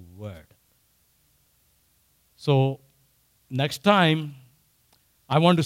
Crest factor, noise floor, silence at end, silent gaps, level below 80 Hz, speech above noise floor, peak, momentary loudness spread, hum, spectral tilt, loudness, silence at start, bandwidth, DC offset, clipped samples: 22 dB; -65 dBFS; 0 s; none; -66 dBFS; 44 dB; -6 dBFS; 21 LU; none; -6.5 dB/octave; -23 LUFS; 0 s; 16 kHz; under 0.1%; under 0.1%